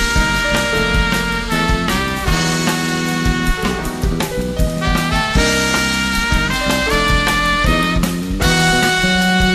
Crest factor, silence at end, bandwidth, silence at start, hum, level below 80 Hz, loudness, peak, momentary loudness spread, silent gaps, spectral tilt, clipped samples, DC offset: 14 dB; 0 s; 14 kHz; 0 s; none; -22 dBFS; -16 LUFS; -2 dBFS; 6 LU; none; -4 dB/octave; under 0.1%; under 0.1%